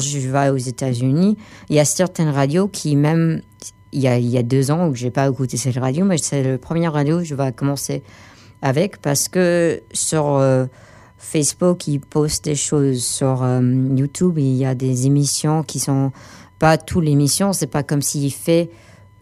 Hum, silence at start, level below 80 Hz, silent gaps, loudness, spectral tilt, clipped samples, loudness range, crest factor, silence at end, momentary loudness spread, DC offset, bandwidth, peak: none; 0 s; -50 dBFS; none; -18 LUFS; -5.5 dB/octave; under 0.1%; 2 LU; 18 dB; 0.5 s; 5 LU; under 0.1%; 15 kHz; 0 dBFS